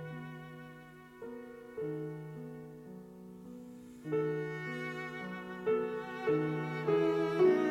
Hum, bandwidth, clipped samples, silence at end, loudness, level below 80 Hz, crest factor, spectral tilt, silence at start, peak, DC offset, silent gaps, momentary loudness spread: none; 16 kHz; under 0.1%; 0 s; -35 LUFS; -72 dBFS; 18 dB; -7.5 dB/octave; 0 s; -16 dBFS; under 0.1%; none; 20 LU